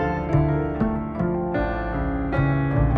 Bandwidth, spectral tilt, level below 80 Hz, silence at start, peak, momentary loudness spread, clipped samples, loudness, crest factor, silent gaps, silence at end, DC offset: 4.8 kHz; -10 dB/octave; -30 dBFS; 0 s; -8 dBFS; 4 LU; under 0.1%; -24 LUFS; 14 dB; none; 0 s; under 0.1%